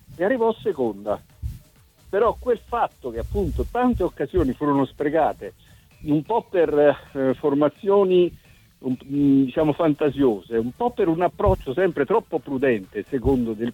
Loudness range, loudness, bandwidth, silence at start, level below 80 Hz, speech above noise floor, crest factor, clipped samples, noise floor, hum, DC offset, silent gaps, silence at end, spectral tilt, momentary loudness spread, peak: 4 LU; -22 LUFS; 16.5 kHz; 0.1 s; -40 dBFS; 32 dB; 16 dB; under 0.1%; -53 dBFS; none; under 0.1%; none; 0 s; -8.5 dB/octave; 10 LU; -6 dBFS